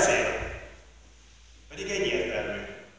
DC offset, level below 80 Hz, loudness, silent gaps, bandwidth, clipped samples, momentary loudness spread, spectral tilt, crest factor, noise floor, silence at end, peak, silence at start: under 0.1%; -48 dBFS; -29 LUFS; none; 8 kHz; under 0.1%; 18 LU; -2.5 dB/octave; 20 dB; -54 dBFS; 0.1 s; -12 dBFS; 0 s